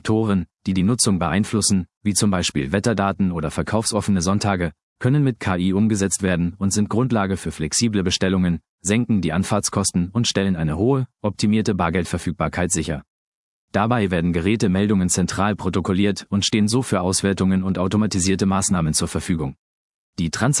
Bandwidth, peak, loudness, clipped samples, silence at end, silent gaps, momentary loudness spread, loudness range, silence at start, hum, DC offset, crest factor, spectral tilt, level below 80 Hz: 12 kHz; -2 dBFS; -20 LUFS; under 0.1%; 0 s; 1.97-2.01 s, 4.83-4.96 s, 8.69-8.78 s, 13.08-13.68 s, 19.58-20.13 s; 5 LU; 2 LU; 0.05 s; none; under 0.1%; 18 dB; -5 dB/octave; -46 dBFS